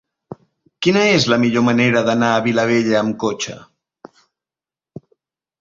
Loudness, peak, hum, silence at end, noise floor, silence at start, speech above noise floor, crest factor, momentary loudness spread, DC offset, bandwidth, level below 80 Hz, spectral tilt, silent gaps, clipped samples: -16 LUFS; -2 dBFS; none; 2 s; under -90 dBFS; 0.3 s; over 74 dB; 18 dB; 8 LU; under 0.1%; 7.6 kHz; -56 dBFS; -5 dB/octave; none; under 0.1%